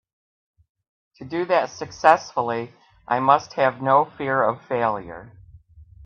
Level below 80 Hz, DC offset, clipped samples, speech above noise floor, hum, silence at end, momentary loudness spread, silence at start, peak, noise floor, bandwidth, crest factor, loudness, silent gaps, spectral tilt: -58 dBFS; under 0.1%; under 0.1%; 27 dB; none; 0.2 s; 13 LU; 1.2 s; 0 dBFS; -48 dBFS; 8.4 kHz; 22 dB; -21 LUFS; none; -5.5 dB/octave